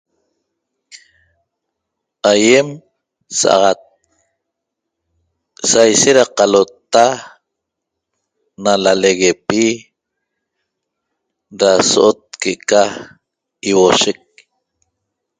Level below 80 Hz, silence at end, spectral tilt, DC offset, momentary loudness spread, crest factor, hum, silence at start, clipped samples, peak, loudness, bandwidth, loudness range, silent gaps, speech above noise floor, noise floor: -58 dBFS; 1.25 s; -2.5 dB/octave; under 0.1%; 11 LU; 16 dB; none; 0.95 s; under 0.1%; 0 dBFS; -13 LUFS; 9.8 kHz; 3 LU; none; 66 dB; -78 dBFS